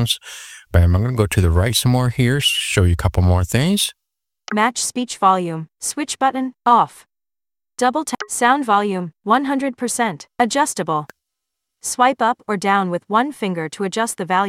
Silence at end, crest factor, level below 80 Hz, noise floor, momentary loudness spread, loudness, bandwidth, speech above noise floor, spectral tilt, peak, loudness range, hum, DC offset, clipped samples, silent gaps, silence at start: 0 s; 18 dB; -34 dBFS; under -90 dBFS; 8 LU; -18 LUFS; 16 kHz; over 72 dB; -4.5 dB/octave; -2 dBFS; 3 LU; none; under 0.1%; under 0.1%; none; 0 s